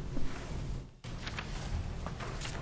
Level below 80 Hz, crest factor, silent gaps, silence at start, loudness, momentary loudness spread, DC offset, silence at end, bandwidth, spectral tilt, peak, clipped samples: -42 dBFS; 14 dB; none; 0 s; -41 LUFS; 4 LU; under 0.1%; 0 s; 8 kHz; -5 dB/octave; -22 dBFS; under 0.1%